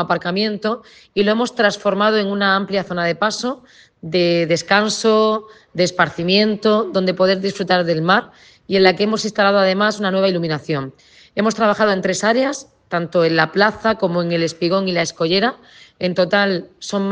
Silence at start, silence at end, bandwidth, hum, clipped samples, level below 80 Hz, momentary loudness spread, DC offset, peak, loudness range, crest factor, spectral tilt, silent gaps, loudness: 0 s; 0 s; 9.8 kHz; none; under 0.1%; -58 dBFS; 9 LU; under 0.1%; 0 dBFS; 2 LU; 18 dB; -4.5 dB/octave; none; -17 LUFS